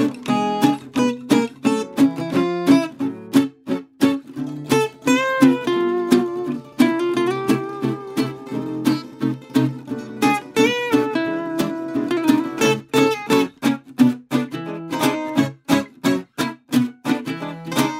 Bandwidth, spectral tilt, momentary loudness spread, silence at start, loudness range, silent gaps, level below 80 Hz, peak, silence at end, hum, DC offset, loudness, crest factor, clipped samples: 16 kHz; -5 dB/octave; 9 LU; 0 s; 3 LU; none; -62 dBFS; 0 dBFS; 0 s; none; under 0.1%; -20 LUFS; 18 dB; under 0.1%